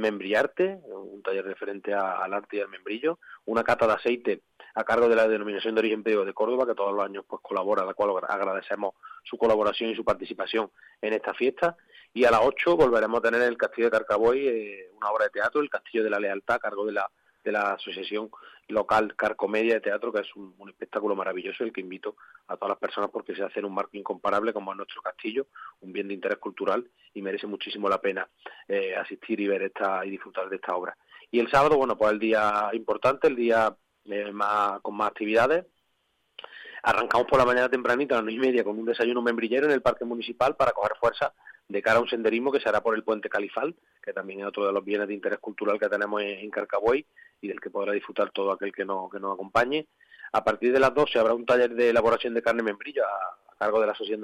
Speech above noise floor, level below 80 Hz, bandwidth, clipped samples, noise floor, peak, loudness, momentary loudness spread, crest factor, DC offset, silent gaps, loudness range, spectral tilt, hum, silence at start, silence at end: 47 dB; -60 dBFS; 12.5 kHz; under 0.1%; -73 dBFS; -8 dBFS; -26 LUFS; 12 LU; 18 dB; under 0.1%; none; 7 LU; -5.5 dB/octave; none; 0 s; 0 s